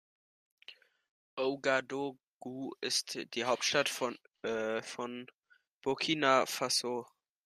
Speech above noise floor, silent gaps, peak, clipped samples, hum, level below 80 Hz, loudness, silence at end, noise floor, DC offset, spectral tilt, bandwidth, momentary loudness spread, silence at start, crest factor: 24 dB; 1.09-1.37 s, 2.27-2.41 s, 5.34-5.38 s, 5.75-5.81 s; -12 dBFS; under 0.1%; none; -80 dBFS; -34 LUFS; 0.4 s; -58 dBFS; under 0.1%; -2 dB/octave; 14.5 kHz; 17 LU; 0.7 s; 24 dB